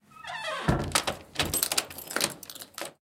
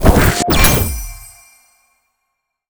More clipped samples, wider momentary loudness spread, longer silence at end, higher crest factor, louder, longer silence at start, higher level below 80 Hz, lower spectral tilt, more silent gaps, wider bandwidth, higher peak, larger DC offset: neither; second, 13 LU vs 20 LU; second, 0.15 s vs 1.45 s; first, 28 dB vs 16 dB; second, -29 LUFS vs -12 LUFS; about the same, 0.1 s vs 0 s; second, -46 dBFS vs -20 dBFS; second, -2.5 dB/octave vs -4 dB/octave; neither; second, 17 kHz vs over 20 kHz; second, -4 dBFS vs 0 dBFS; neither